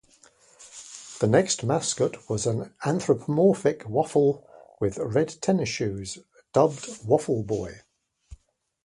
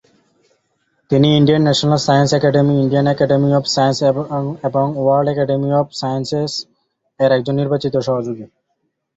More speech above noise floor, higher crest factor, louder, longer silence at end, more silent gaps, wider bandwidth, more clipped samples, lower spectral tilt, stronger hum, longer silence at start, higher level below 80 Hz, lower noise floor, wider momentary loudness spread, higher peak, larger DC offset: second, 37 dB vs 55 dB; first, 20 dB vs 14 dB; second, -25 LUFS vs -16 LUFS; second, 0.5 s vs 0.7 s; neither; first, 11.5 kHz vs 8 kHz; neither; about the same, -5.5 dB/octave vs -6 dB/octave; neither; second, 0.6 s vs 1.1 s; about the same, -56 dBFS vs -52 dBFS; second, -62 dBFS vs -70 dBFS; first, 16 LU vs 8 LU; second, -6 dBFS vs -2 dBFS; neither